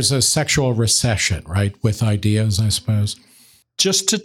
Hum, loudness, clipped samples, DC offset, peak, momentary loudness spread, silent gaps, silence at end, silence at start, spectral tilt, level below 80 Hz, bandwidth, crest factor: none; -18 LUFS; under 0.1%; under 0.1%; -2 dBFS; 6 LU; none; 0 s; 0 s; -3.5 dB/octave; -44 dBFS; 15.5 kHz; 18 dB